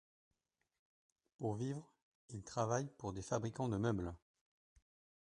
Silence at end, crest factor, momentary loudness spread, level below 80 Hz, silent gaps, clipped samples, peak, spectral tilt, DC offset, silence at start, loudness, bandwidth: 1.1 s; 22 dB; 12 LU; -64 dBFS; 2.02-2.29 s; under 0.1%; -22 dBFS; -6.5 dB/octave; under 0.1%; 1.4 s; -42 LUFS; 10.5 kHz